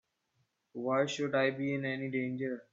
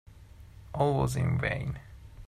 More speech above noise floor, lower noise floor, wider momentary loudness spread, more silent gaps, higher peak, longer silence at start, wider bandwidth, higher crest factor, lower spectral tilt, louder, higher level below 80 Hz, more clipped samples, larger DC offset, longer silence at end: first, 45 dB vs 22 dB; first, -78 dBFS vs -51 dBFS; second, 8 LU vs 16 LU; neither; about the same, -16 dBFS vs -14 dBFS; first, 0.75 s vs 0.1 s; second, 7.8 kHz vs 14 kHz; about the same, 20 dB vs 18 dB; second, -5.5 dB/octave vs -7 dB/octave; second, -33 LUFS vs -30 LUFS; second, -80 dBFS vs -48 dBFS; neither; neither; about the same, 0.1 s vs 0 s